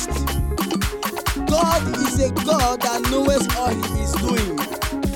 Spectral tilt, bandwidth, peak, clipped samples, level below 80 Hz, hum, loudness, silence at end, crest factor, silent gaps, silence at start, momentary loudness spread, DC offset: -4.5 dB/octave; 17.5 kHz; -6 dBFS; under 0.1%; -28 dBFS; none; -21 LUFS; 0 s; 16 dB; none; 0 s; 6 LU; under 0.1%